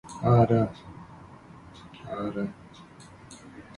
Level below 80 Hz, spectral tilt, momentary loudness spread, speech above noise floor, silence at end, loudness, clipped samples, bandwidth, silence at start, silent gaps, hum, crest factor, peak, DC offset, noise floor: -54 dBFS; -8.5 dB/octave; 27 LU; 24 dB; 0.15 s; -26 LUFS; under 0.1%; 11 kHz; 0.05 s; none; none; 20 dB; -8 dBFS; under 0.1%; -49 dBFS